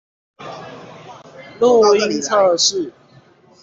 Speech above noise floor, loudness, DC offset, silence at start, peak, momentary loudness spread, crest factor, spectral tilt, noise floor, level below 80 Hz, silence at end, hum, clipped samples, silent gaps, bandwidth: 35 dB; -15 LUFS; under 0.1%; 0.4 s; -2 dBFS; 24 LU; 16 dB; -2.5 dB/octave; -49 dBFS; -62 dBFS; 0.7 s; none; under 0.1%; none; 8 kHz